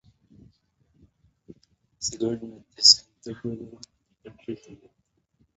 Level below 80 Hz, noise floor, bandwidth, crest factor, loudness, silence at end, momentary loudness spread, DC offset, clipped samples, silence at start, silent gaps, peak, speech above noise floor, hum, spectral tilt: -64 dBFS; -72 dBFS; 8 kHz; 28 dB; -21 LUFS; 0.85 s; 27 LU; under 0.1%; under 0.1%; 2 s; none; -2 dBFS; 47 dB; none; -3 dB/octave